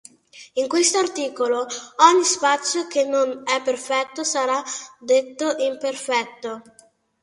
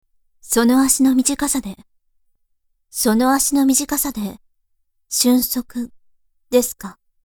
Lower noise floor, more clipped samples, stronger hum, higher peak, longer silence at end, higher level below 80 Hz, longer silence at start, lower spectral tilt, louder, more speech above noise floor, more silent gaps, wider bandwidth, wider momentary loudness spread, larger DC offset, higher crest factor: second, -46 dBFS vs -66 dBFS; neither; neither; about the same, 0 dBFS vs 0 dBFS; first, 0.6 s vs 0.35 s; second, -74 dBFS vs -48 dBFS; about the same, 0.35 s vs 0.45 s; second, -0.5 dB/octave vs -2.5 dB/octave; second, -21 LUFS vs -17 LUFS; second, 25 dB vs 49 dB; neither; second, 11.5 kHz vs over 20 kHz; second, 13 LU vs 16 LU; neither; about the same, 22 dB vs 20 dB